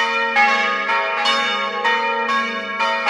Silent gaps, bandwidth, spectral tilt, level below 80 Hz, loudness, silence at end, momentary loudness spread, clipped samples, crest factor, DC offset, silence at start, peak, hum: none; 11.5 kHz; -1.5 dB/octave; -70 dBFS; -17 LUFS; 0 s; 5 LU; under 0.1%; 16 dB; under 0.1%; 0 s; -4 dBFS; none